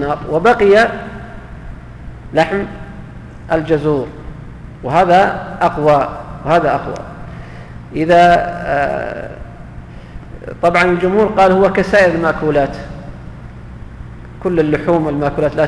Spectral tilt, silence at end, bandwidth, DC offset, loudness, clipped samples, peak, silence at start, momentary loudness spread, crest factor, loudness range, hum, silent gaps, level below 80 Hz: -7 dB/octave; 0 s; 11 kHz; under 0.1%; -14 LUFS; under 0.1%; -2 dBFS; 0 s; 23 LU; 14 dB; 5 LU; none; none; -34 dBFS